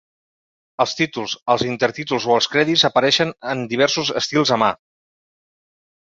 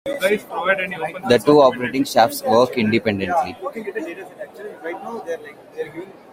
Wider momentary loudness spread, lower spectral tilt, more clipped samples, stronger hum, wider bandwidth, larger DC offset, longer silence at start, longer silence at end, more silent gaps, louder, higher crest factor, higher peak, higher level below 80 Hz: second, 8 LU vs 18 LU; second, -3.5 dB/octave vs -5 dB/octave; neither; neither; second, 7.8 kHz vs 16 kHz; neither; first, 0.8 s vs 0.05 s; first, 1.35 s vs 0.2 s; first, 1.42-1.46 s vs none; about the same, -18 LUFS vs -19 LUFS; about the same, 18 dB vs 18 dB; about the same, -2 dBFS vs -2 dBFS; about the same, -60 dBFS vs -58 dBFS